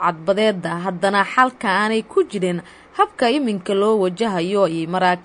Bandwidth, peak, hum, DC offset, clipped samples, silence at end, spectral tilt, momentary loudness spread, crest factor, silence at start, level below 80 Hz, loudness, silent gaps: 11 kHz; -2 dBFS; none; under 0.1%; under 0.1%; 0.05 s; -5.5 dB/octave; 6 LU; 18 dB; 0 s; -60 dBFS; -19 LUFS; none